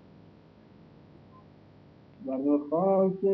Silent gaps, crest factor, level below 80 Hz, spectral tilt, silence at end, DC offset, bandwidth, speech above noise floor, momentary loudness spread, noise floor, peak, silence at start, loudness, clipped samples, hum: none; 16 dB; -70 dBFS; -12 dB/octave; 0 s; under 0.1%; 4.7 kHz; 29 dB; 11 LU; -55 dBFS; -14 dBFS; 2.2 s; -27 LUFS; under 0.1%; none